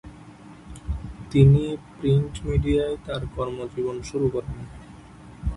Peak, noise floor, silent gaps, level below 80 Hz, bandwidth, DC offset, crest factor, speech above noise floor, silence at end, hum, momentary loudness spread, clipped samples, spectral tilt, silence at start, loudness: -4 dBFS; -45 dBFS; none; -36 dBFS; 10.5 kHz; under 0.1%; 22 dB; 23 dB; 0 s; none; 21 LU; under 0.1%; -8 dB/octave; 0.05 s; -24 LUFS